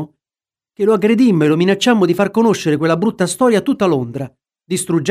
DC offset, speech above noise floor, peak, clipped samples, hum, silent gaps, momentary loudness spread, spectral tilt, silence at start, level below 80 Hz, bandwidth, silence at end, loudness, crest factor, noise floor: under 0.1%; over 76 dB; -2 dBFS; under 0.1%; none; none; 10 LU; -5.5 dB/octave; 0 s; -58 dBFS; 15.5 kHz; 0 s; -15 LUFS; 12 dB; under -90 dBFS